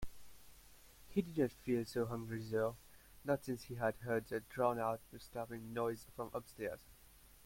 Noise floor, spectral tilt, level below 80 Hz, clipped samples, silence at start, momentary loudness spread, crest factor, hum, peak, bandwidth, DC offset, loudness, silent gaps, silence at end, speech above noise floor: -63 dBFS; -6.5 dB/octave; -64 dBFS; under 0.1%; 0 s; 10 LU; 20 dB; none; -22 dBFS; 16.5 kHz; under 0.1%; -41 LUFS; none; 0 s; 23 dB